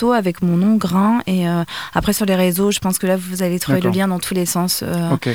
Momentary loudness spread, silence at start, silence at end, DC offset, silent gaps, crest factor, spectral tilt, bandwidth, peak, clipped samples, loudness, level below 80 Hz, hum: 4 LU; 0 s; 0 s; 0.4%; none; 16 dB; -5 dB/octave; over 20 kHz; -2 dBFS; under 0.1%; -17 LUFS; -44 dBFS; none